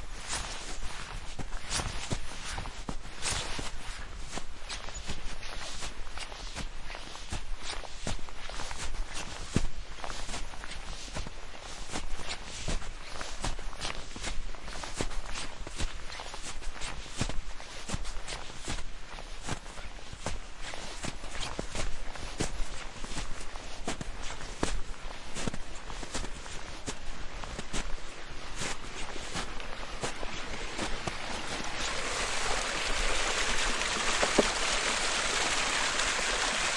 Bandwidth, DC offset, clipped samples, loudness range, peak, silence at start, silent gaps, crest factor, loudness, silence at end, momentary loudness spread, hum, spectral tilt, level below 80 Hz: 11.5 kHz; under 0.1%; under 0.1%; 12 LU; -8 dBFS; 0 s; none; 24 dB; -35 LUFS; 0 s; 14 LU; none; -2 dB/octave; -40 dBFS